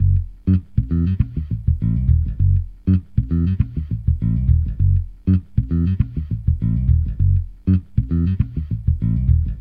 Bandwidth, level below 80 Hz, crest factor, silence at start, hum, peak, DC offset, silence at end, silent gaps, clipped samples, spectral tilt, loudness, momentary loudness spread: 3.3 kHz; -24 dBFS; 14 dB; 0 s; none; -4 dBFS; under 0.1%; 0 s; none; under 0.1%; -12 dB/octave; -20 LUFS; 4 LU